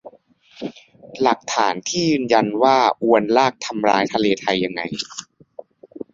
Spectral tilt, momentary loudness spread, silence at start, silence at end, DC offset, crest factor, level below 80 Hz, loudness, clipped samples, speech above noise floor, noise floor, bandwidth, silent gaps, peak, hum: -4 dB/octave; 18 LU; 0.05 s; 0.15 s; under 0.1%; 18 dB; -60 dBFS; -19 LUFS; under 0.1%; 33 dB; -52 dBFS; 8 kHz; none; -2 dBFS; none